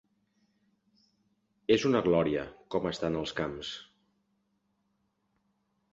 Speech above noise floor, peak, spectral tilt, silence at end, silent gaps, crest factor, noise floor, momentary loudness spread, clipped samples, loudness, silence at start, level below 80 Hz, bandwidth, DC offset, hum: 47 dB; -10 dBFS; -5.5 dB/octave; 2.1 s; none; 22 dB; -77 dBFS; 14 LU; under 0.1%; -30 LUFS; 1.7 s; -60 dBFS; 7.8 kHz; under 0.1%; none